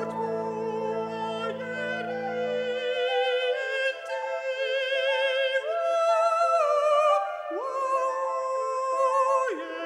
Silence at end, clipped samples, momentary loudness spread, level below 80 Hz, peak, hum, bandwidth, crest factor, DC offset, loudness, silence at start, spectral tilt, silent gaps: 0 s; under 0.1%; 8 LU; -78 dBFS; -12 dBFS; 60 Hz at -80 dBFS; 11 kHz; 14 dB; under 0.1%; -26 LUFS; 0 s; -3 dB/octave; none